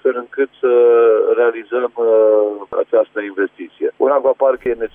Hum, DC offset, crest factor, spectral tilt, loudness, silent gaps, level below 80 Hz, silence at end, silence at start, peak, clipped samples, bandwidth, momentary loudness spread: none; under 0.1%; 12 dB; -7.5 dB/octave; -15 LUFS; none; -58 dBFS; 0.1 s; 0.05 s; -4 dBFS; under 0.1%; 3.6 kHz; 10 LU